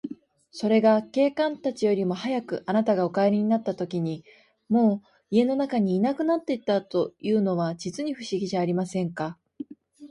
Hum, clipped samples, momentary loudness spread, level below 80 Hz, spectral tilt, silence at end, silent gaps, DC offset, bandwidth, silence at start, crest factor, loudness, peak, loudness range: none; under 0.1%; 11 LU; -70 dBFS; -7 dB/octave; 0 s; none; under 0.1%; 11 kHz; 0.05 s; 18 dB; -25 LUFS; -8 dBFS; 3 LU